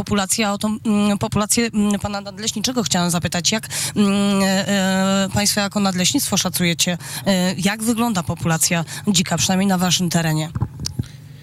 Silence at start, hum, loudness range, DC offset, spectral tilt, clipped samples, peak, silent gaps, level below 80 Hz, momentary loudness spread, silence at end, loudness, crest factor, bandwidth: 0 s; none; 2 LU; under 0.1%; -3.5 dB/octave; under 0.1%; -8 dBFS; none; -46 dBFS; 6 LU; 0 s; -19 LUFS; 12 dB; 16 kHz